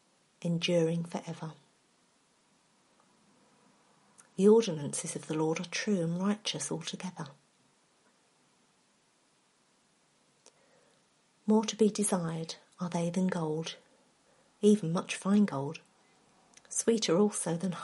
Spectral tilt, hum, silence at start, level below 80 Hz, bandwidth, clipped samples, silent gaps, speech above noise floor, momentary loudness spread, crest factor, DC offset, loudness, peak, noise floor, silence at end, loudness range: -5 dB/octave; none; 0.4 s; -80 dBFS; 11.5 kHz; under 0.1%; none; 40 dB; 15 LU; 22 dB; under 0.1%; -31 LUFS; -12 dBFS; -70 dBFS; 0 s; 11 LU